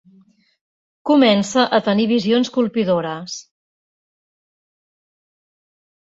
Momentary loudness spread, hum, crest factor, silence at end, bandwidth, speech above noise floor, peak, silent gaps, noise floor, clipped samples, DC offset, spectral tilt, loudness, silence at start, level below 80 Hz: 15 LU; none; 18 dB; 2.75 s; 8 kHz; 37 dB; -2 dBFS; none; -54 dBFS; under 0.1%; under 0.1%; -5 dB/octave; -17 LUFS; 1.05 s; -64 dBFS